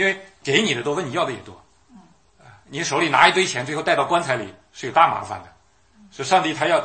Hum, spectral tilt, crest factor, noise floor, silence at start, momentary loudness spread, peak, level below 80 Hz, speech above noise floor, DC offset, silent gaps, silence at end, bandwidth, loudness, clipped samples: none; -3.5 dB/octave; 22 dB; -55 dBFS; 0 s; 18 LU; 0 dBFS; -62 dBFS; 35 dB; under 0.1%; none; 0 s; 11 kHz; -20 LUFS; under 0.1%